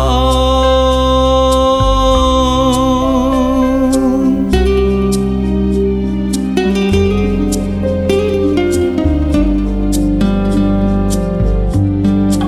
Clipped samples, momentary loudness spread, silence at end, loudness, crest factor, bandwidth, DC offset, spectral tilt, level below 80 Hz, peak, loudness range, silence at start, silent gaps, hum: under 0.1%; 4 LU; 0 s; -13 LUFS; 10 dB; 13.5 kHz; under 0.1%; -6.5 dB/octave; -18 dBFS; -2 dBFS; 3 LU; 0 s; none; none